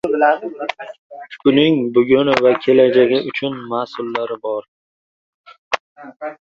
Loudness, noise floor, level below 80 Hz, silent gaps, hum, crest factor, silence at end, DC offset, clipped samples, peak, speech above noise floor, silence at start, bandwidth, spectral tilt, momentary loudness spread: -17 LUFS; under -90 dBFS; -58 dBFS; 0.99-1.10 s, 4.68-5.44 s, 5.58-5.71 s, 5.80-5.96 s; none; 18 dB; 0.15 s; under 0.1%; under 0.1%; 0 dBFS; over 74 dB; 0.05 s; 7.6 kHz; -6.5 dB/octave; 18 LU